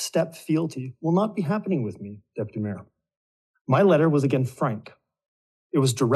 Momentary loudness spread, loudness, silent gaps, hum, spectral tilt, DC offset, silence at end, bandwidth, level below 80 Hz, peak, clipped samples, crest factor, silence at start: 16 LU; -24 LUFS; 3.17-3.54 s, 3.61-3.65 s, 5.28-5.70 s; none; -6.5 dB/octave; under 0.1%; 0 s; 12.5 kHz; -74 dBFS; -6 dBFS; under 0.1%; 18 dB; 0 s